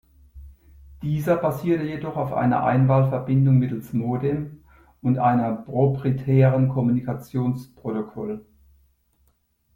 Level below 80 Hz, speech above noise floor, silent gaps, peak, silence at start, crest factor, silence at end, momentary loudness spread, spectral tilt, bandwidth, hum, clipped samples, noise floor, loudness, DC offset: -52 dBFS; 44 dB; none; -6 dBFS; 0.35 s; 18 dB; 1.35 s; 12 LU; -10 dB/octave; 15.5 kHz; none; under 0.1%; -66 dBFS; -22 LUFS; under 0.1%